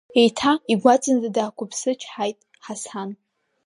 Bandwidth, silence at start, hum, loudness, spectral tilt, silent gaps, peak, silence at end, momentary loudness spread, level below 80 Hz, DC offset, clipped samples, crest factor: 11.5 kHz; 0.15 s; none; -21 LUFS; -4 dB/octave; none; -2 dBFS; 0.5 s; 16 LU; -66 dBFS; under 0.1%; under 0.1%; 20 dB